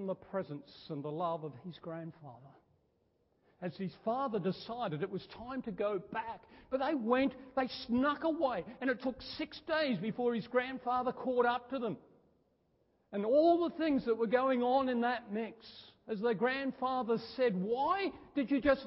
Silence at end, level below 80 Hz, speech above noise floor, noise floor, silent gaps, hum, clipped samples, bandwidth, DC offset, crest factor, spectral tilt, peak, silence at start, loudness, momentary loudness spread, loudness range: 0 s; -68 dBFS; 41 dB; -75 dBFS; none; none; under 0.1%; 5.6 kHz; under 0.1%; 18 dB; -4 dB/octave; -16 dBFS; 0 s; -35 LUFS; 14 LU; 9 LU